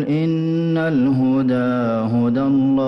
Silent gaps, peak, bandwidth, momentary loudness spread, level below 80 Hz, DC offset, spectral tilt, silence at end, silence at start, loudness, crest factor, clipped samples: none; -10 dBFS; 6 kHz; 3 LU; -54 dBFS; under 0.1%; -9.5 dB/octave; 0 s; 0 s; -18 LUFS; 8 dB; under 0.1%